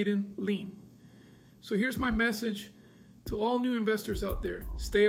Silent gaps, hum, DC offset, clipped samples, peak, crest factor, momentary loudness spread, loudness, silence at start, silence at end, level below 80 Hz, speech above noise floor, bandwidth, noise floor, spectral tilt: none; none; under 0.1%; under 0.1%; -14 dBFS; 16 dB; 17 LU; -32 LUFS; 0 s; 0 s; -46 dBFS; 26 dB; 16.5 kHz; -56 dBFS; -5.5 dB/octave